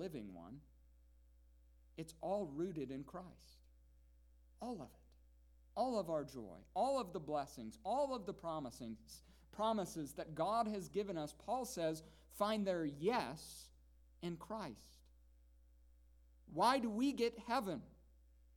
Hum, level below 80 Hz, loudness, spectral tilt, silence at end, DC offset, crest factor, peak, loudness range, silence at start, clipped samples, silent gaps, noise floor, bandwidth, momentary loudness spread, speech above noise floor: none; -68 dBFS; -42 LUFS; -5 dB/octave; 0.6 s; under 0.1%; 24 dB; -20 dBFS; 7 LU; 0 s; under 0.1%; none; -67 dBFS; 19 kHz; 16 LU; 25 dB